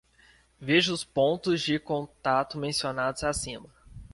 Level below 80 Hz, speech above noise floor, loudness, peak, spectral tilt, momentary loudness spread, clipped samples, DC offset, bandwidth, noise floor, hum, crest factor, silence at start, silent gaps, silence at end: -54 dBFS; 33 dB; -27 LUFS; -10 dBFS; -4 dB/octave; 10 LU; under 0.1%; under 0.1%; 11.5 kHz; -60 dBFS; none; 20 dB; 0.6 s; none; 0.1 s